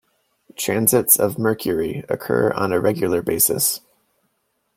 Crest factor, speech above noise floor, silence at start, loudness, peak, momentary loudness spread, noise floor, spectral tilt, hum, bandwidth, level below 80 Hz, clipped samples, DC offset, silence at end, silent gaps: 20 dB; 51 dB; 0.6 s; -19 LUFS; 0 dBFS; 10 LU; -70 dBFS; -4 dB/octave; none; 16.5 kHz; -56 dBFS; under 0.1%; under 0.1%; 1 s; none